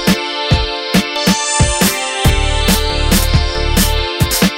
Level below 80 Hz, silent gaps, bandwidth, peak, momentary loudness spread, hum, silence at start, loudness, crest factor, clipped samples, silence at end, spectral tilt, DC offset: -18 dBFS; none; 16.5 kHz; 0 dBFS; 3 LU; none; 0 s; -14 LUFS; 14 dB; under 0.1%; 0 s; -3.5 dB/octave; under 0.1%